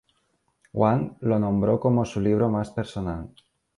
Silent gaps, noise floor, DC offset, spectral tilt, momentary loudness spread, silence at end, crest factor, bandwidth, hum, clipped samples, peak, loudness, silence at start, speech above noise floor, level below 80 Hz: none; -70 dBFS; under 0.1%; -8.5 dB/octave; 11 LU; 0.5 s; 18 dB; 11 kHz; none; under 0.1%; -6 dBFS; -24 LUFS; 0.75 s; 47 dB; -48 dBFS